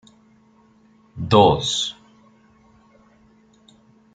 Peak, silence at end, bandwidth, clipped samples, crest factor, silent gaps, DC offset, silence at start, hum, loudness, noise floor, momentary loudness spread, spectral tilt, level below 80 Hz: -2 dBFS; 2.2 s; 9.4 kHz; under 0.1%; 22 dB; none; under 0.1%; 1.15 s; none; -18 LUFS; -55 dBFS; 19 LU; -5 dB/octave; -50 dBFS